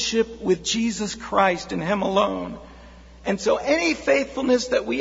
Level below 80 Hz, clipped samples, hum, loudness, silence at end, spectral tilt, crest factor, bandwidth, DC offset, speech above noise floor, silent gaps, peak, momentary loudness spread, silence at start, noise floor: -48 dBFS; under 0.1%; none; -22 LUFS; 0 s; -4 dB/octave; 18 dB; 8 kHz; under 0.1%; 22 dB; none; -4 dBFS; 8 LU; 0 s; -45 dBFS